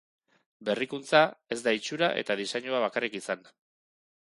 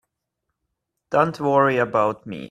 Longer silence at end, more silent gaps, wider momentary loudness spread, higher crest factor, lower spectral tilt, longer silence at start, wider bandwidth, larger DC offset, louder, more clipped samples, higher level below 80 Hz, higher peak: first, 0.95 s vs 0.05 s; neither; first, 12 LU vs 6 LU; about the same, 24 dB vs 20 dB; second, -3.5 dB/octave vs -7 dB/octave; second, 0.6 s vs 1.1 s; second, 11.5 kHz vs 13 kHz; neither; second, -29 LUFS vs -20 LUFS; neither; second, -78 dBFS vs -62 dBFS; about the same, -6 dBFS vs -4 dBFS